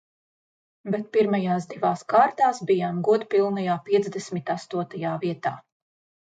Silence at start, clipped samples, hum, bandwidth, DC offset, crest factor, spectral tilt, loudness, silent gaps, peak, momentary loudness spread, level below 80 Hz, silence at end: 0.85 s; under 0.1%; none; 9.2 kHz; under 0.1%; 18 dB; -6.5 dB/octave; -24 LUFS; none; -8 dBFS; 10 LU; -74 dBFS; 0.6 s